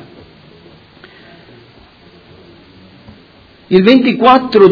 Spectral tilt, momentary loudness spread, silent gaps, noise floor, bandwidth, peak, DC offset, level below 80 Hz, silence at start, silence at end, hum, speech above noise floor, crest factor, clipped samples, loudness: -8 dB/octave; 4 LU; none; -43 dBFS; 5.4 kHz; 0 dBFS; under 0.1%; -50 dBFS; 3.7 s; 0 s; none; 36 dB; 14 dB; 0.7%; -9 LUFS